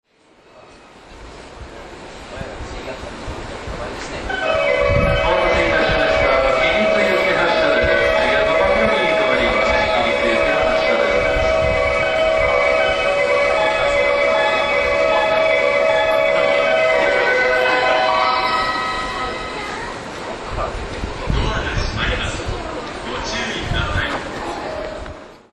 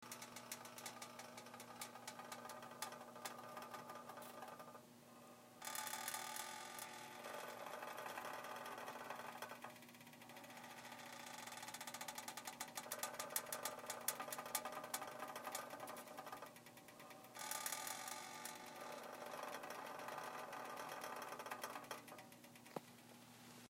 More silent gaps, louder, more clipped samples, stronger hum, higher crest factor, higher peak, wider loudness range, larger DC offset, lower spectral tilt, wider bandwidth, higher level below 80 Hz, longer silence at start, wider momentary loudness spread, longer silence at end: neither; first, -17 LUFS vs -50 LUFS; neither; neither; second, 14 dB vs 30 dB; first, -2 dBFS vs -22 dBFS; first, 9 LU vs 6 LU; neither; first, -4.5 dB/octave vs -1.5 dB/octave; second, 12 kHz vs 16 kHz; first, -32 dBFS vs under -90 dBFS; first, 0.55 s vs 0 s; about the same, 15 LU vs 13 LU; first, 0.15 s vs 0 s